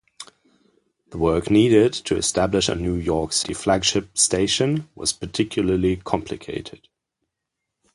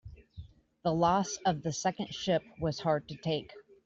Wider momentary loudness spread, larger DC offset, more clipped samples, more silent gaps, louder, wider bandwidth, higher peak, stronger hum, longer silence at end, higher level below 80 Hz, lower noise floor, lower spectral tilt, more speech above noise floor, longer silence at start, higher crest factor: second, 15 LU vs 23 LU; neither; neither; neither; first, -21 LUFS vs -32 LUFS; first, 11.5 kHz vs 8 kHz; first, -4 dBFS vs -14 dBFS; neither; first, 1.2 s vs 0.25 s; first, -42 dBFS vs -58 dBFS; first, -81 dBFS vs -51 dBFS; about the same, -4 dB/octave vs -5 dB/octave; first, 60 dB vs 20 dB; first, 0.2 s vs 0.05 s; about the same, 18 dB vs 18 dB